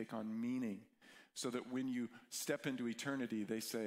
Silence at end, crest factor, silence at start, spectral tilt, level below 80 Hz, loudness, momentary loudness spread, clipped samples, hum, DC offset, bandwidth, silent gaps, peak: 0 s; 18 dB; 0 s; -4 dB/octave; -86 dBFS; -43 LUFS; 9 LU; under 0.1%; none; under 0.1%; 16 kHz; none; -26 dBFS